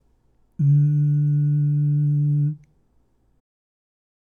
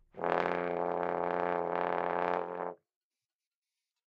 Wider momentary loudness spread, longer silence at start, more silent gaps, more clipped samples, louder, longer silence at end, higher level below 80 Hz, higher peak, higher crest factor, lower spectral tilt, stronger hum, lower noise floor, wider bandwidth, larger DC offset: about the same, 6 LU vs 5 LU; first, 0.6 s vs 0.15 s; neither; neither; first, -20 LUFS vs -34 LUFS; first, 1.8 s vs 1.3 s; first, -64 dBFS vs -74 dBFS; about the same, -12 dBFS vs -10 dBFS; second, 10 dB vs 24 dB; first, -13 dB/octave vs -7.5 dB/octave; neither; second, -62 dBFS vs under -90 dBFS; second, 1.6 kHz vs 7 kHz; neither